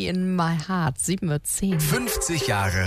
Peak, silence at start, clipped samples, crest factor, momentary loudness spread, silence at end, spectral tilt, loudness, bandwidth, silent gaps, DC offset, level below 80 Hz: -12 dBFS; 0 s; under 0.1%; 12 dB; 2 LU; 0 s; -4.5 dB/octave; -24 LUFS; 15.5 kHz; none; under 0.1%; -42 dBFS